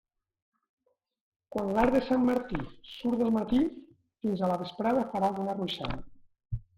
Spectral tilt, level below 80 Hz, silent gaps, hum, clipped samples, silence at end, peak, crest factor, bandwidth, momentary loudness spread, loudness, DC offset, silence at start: -7 dB/octave; -50 dBFS; none; none; under 0.1%; 0.2 s; -10 dBFS; 20 dB; 13.5 kHz; 12 LU; -30 LUFS; under 0.1%; 1.5 s